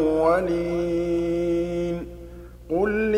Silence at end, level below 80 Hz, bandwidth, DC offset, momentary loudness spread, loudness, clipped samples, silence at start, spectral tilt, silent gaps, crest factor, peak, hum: 0 s; -42 dBFS; 10.5 kHz; under 0.1%; 19 LU; -24 LUFS; under 0.1%; 0 s; -7.5 dB/octave; none; 16 dB; -8 dBFS; 60 Hz at -40 dBFS